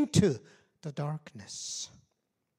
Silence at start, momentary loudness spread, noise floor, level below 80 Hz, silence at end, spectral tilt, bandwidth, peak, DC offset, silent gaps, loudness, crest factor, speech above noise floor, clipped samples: 0 s; 17 LU; -81 dBFS; -58 dBFS; 0.7 s; -5.5 dB/octave; 14.5 kHz; -10 dBFS; under 0.1%; none; -34 LUFS; 24 dB; 49 dB; under 0.1%